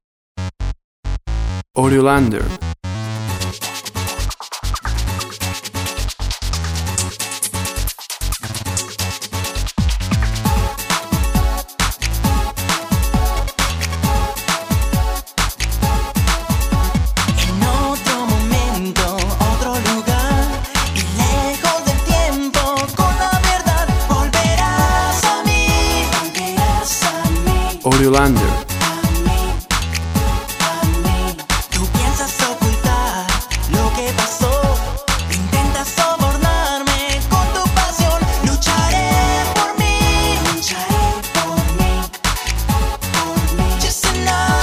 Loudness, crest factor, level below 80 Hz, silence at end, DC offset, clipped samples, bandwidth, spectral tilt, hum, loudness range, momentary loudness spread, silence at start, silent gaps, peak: -17 LUFS; 16 dB; -22 dBFS; 0 s; under 0.1%; under 0.1%; 16 kHz; -4 dB/octave; none; 6 LU; 8 LU; 0.35 s; 0.84-1.03 s; 0 dBFS